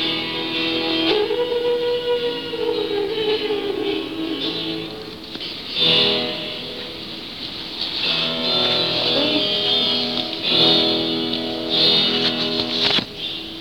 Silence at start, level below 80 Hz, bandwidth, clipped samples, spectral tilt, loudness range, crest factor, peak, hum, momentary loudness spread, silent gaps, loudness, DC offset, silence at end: 0 s; -54 dBFS; 18.5 kHz; under 0.1%; -4.5 dB/octave; 6 LU; 18 dB; -4 dBFS; none; 14 LU; none; -19 LUFS; 0.3%; 0 s